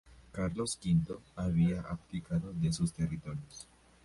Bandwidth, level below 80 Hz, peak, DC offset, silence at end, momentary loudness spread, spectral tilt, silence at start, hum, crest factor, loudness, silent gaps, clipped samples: 11.5 kHz; -50 dBFS; -20 dBFS; under 0.1%; 0.4 s; 15 LU; -6.5 dB/octave; 0.05 s; none; 16 dB; -34 LUFS; none; under 0.1%